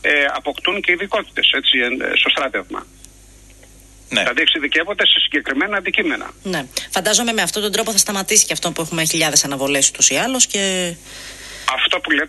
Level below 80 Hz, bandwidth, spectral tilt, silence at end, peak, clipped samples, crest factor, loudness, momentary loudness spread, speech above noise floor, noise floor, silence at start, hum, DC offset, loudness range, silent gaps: -50 dBFS; 13 kHz; -1 dB/octave; 0 s; 0 dBFS; under 0.1%; 18 dB; -16 LUFS; 11 LU; 26 dB; -44 dBFS; 0.05 s; none; under 0.1%; 3 LU; none